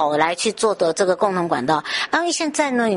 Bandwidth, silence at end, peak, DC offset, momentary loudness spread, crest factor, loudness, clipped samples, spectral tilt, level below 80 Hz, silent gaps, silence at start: 11.5 kHz; 0 s; -2 dBFS; under 0.1%; 2 LU; 16 dB; -20 LUFS; under 0.1%; -3.5 dB/octave; -62 dBFS; none; 0 s